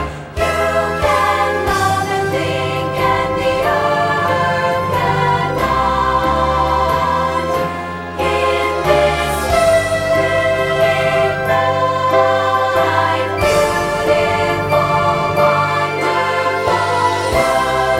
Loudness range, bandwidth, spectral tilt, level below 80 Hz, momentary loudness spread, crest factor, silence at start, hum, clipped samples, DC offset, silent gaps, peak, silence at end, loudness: 2 LU; 16.5 kHz; -5 dB/octave; -34 dBFS; 4 LU; 14 dB; 0 s; none; under 0.1%; under 0.1%; none; 0 dBFS; 0 s; -15 LUFS